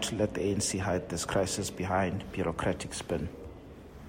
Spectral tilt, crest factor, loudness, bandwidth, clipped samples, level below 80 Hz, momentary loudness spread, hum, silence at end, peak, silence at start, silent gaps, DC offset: -4.5 dB/octave; 18 dB; -32 LUFS; 16 kHz; under 0.1%; -52 dBFS; 13 LU; none; 0 s; -14 dBFS; 0 s; none; under 0.1%